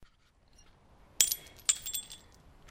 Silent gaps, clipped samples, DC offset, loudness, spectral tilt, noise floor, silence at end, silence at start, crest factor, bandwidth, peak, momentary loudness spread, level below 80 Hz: none; under 0.1%; under 0.1%; -30 LUFS; 2 dB/octave; -65 dBFS; 0 s; 0 s; 34 dB; 16.5 kHz; -4 dBFS; 19 LU; -62 dBFS